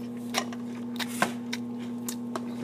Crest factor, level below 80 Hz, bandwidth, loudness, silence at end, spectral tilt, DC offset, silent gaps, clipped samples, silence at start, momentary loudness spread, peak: 24 dB; -74 dBFS; 15.5 kHz; -33 LUFS; 0 s; -3.5 dB/octave; under 0.1%; none; under 0.1%; 0 s; 7 LU; -10 dBFS